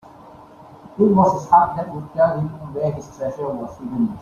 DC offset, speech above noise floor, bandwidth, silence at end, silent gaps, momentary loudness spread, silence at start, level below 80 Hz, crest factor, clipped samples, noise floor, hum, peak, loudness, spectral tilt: under 0.1%; 24 dB; 7.4 kHz; 0 s; none; 14 LU; 0.25 s; -52 dBFS; 18 dB; under 0.1%; -43 dBFS; none; -2 dBFS; -20 LUFS; -9 dB/octave